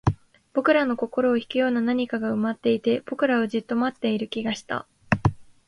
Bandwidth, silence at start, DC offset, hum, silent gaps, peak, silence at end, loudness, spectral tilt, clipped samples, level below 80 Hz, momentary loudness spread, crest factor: 10.5 kHz; 0.05 s; under 0.1%; none; none; -4 dBFS; 0.25 s; -24 LUFS; -7 dB/octave; under 0.1%; -48 dBFS; 7 LU; 20 dB